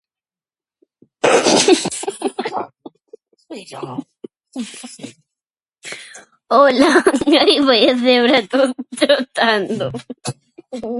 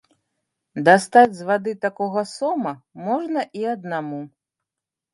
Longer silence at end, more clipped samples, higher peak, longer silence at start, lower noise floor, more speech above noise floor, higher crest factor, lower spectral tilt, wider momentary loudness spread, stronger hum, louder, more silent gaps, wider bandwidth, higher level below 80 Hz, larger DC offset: second, 0 s vs 0.85 s; neither; about the same, 0 dBFS vs 0 dBFS; first, 1.25 s vs 0.75 s; about the same, under -90 dBFS vs -87 dBFS; first, over 75 dB vs 67 dB; about the same, 18 dB vs 22 dB; second, -3 dB/octave vs -5.5 dB/octave; first, 21 LU vs 17 LU; neither; first, -14 LUFS vs -20 LUFS; neither; about the same, 11.5 kHz vs 11.5 kHz; first, -60 dBFS vs -70 dBFS; neither